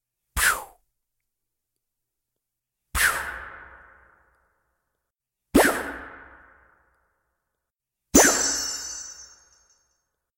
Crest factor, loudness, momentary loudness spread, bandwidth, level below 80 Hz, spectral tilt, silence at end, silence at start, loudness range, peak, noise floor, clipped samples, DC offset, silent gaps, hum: 26 dB; -22 LUFS; 23 LU; 16.5 kHz; -46 dBFS; -2 dB/octave; 1.1 s; 0.35 s; 7 LU; -2 dBFS; -85 dBFS; under 0.1%; under 0.1%; none; none